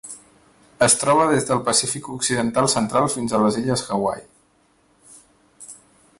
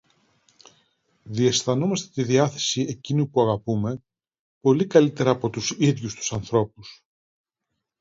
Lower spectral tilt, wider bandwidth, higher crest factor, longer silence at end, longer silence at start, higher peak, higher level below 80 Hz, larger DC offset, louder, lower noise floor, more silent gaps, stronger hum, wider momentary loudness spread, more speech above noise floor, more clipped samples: second, -3.5 dB/octave vs -5 dB/octave; first, 12 kHz vs 7.8 kHz; about the same, 18 dB vs 22 dB; second, 0.45 s vs 1.05 s; second, 0.05 s vs 1.25 s; about the same, -4 dBFS vs -2 dBFS; about the same, -56 dBFS vs -58 dBFS; neither; first, -19 LUFS vs -23 LUFS; second, -60 dBFS vs -81 dBFS; second, none vs 4.39-4.61 s; neither; first, 21 LU vs 9 LU; second, 40 dB vs 59 dB; neither